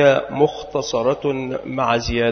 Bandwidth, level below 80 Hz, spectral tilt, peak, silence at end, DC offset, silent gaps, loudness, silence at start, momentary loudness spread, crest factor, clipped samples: 6.6 kHz; -40 dBFS; -5 dB/octave; -2 dBFS; 0 s; under 0.1%; none; -20 LUFS; 0 s; 8 LU; 16 dB; under 0.1%